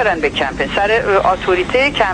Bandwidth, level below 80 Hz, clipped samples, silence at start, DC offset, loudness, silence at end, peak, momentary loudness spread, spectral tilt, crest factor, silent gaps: 10.5 kHz; -34 dBFS; under 0.1%; 0 s; under 0.1%; -15 LUFS; 0 s; -2 dBFS; 4 LU; -4.5 dB/octave; 14 dB; none